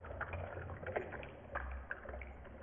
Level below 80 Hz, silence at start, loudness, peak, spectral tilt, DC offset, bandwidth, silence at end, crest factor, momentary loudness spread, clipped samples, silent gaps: -52 dBFS; 0 s; -46 LUFS; -24 dBFS; -2.5 dB/octave; under 0.1%; 3.6 kHz; 0 s; 22 dB; 6 LU; under 0.1%; none